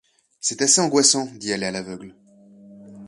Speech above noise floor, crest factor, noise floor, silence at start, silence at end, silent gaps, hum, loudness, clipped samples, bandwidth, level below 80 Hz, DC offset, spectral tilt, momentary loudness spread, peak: 27 dB; 22 dB; -48 dBFS; 0.45 s; 0 s; none; none; -19 LUFS; under 0.1%; 11.5 kHz; -64 dBFS; under 0.1%; -2 dB/octave; 17 LU; -2 dBFS